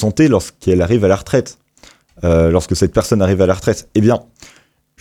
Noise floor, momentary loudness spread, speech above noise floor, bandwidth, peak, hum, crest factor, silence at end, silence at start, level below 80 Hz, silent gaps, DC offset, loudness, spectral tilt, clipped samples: -47 dBFS; 5 LU; 33 dB; 16 kHz; -2 dBFS; none; 14 dB; 0.8 s; 0 s; -34 dBFS; none; under 0.1%; -15 LUFS; -6.5 dB/octave; under 0.1%